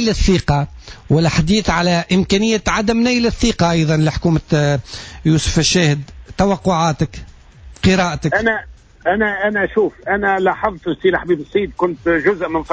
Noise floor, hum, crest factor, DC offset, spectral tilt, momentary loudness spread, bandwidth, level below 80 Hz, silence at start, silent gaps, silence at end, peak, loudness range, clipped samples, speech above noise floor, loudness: -40 dBFS; none; 14 dB; under 0.1%; -5 dB/octave; 6 LU; 8 kHz; -32 dBFS; 0 s; none; 0 s; -2 dBFS; 3 LU; under 0.1%; 24 dB; -16 LUFS